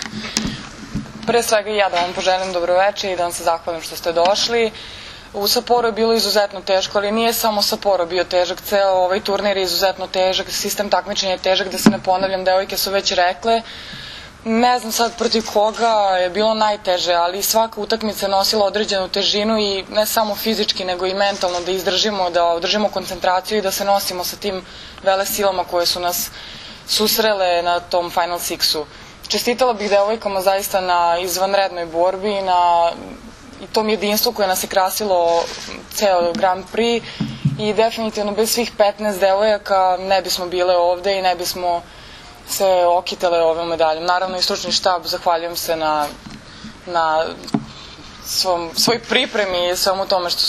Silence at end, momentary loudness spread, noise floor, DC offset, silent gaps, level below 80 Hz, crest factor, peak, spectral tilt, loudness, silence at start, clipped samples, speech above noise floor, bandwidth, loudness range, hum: 0 s; 9 LU; -39 dBFS; under 0.1%; none; -48 dBFS; 18 dB; 0 dBFS; -2.5 dB/octave; -18 LUFS; 0 s; under 0.1%; 21 dB; 14 kHz; 2 LU; none